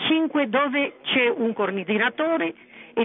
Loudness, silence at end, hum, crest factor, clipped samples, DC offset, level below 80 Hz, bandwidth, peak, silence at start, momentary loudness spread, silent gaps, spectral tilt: -23 LUFS; 0 s; none; 16 dB; under 0.1%; under 0.1%; -76 dBFS; 4 kHz; -8 dBFS; 0 s; 5 LU; none; -9 dB/octave